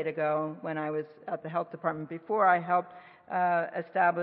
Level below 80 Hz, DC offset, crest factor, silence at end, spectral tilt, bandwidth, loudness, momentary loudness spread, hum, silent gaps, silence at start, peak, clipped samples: -82 dBFS; under 0.1%; 20 dB; 0 s; -10.5 dB/octave; 4.4 kHz; -30 LUFS; 12 LU; none; none; 0 s; -10 dBFS; under 0.1%